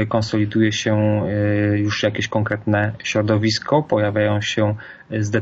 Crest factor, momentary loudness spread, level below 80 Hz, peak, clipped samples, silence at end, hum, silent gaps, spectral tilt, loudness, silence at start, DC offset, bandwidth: 14 dB; 4 LU; -52 dBFS; -4 dBFS; under 0.1%; 0 s; none; none; -6 dB/octave; -19 LUFS; 0 s; under 0.1%; 7.8 kHz